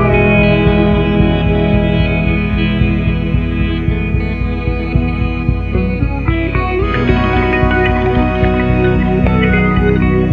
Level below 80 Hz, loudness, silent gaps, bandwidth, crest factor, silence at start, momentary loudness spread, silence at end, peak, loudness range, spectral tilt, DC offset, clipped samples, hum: -20 dBFS; -13 LUFS; none; 5.2 kHz; 12 dB; 0 s; 5 LU; 0 s; 0 dBFS; 4 LU; -9.5 dB/octave; under 0.1%; under 0.1%; none